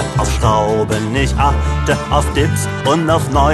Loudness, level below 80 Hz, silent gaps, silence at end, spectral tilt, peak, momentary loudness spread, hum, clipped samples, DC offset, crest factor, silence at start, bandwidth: -15 LUFS; -22 dBFS; none; 0 s; -5.5 dB/octave; 0 dBFS; 3 LU; none; under 0.1%; under 0.1%; 14 dB; 0 s; 12.5 kHz